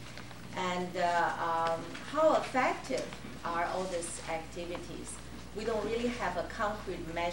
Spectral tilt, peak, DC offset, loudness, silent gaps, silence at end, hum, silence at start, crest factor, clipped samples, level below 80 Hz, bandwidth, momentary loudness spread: -4 dB/octave; -16 dBFS; 0.3%; -34 LUFS; none; 0 s; none; 0 s; 18 dB; under 0.1%; -54 dBFS; 16.5 kHz; 13 LU